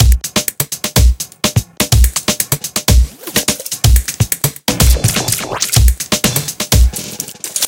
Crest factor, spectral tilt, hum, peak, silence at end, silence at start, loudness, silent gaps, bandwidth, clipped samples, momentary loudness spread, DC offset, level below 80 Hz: 14 dB; -3.5 dB/octave; none; 0 dBFS; 0 s; 0 s; -14 LUFS; none; 17.5 kHz; under 0.1%; 6 LU; under 0.1%; -16 dBFS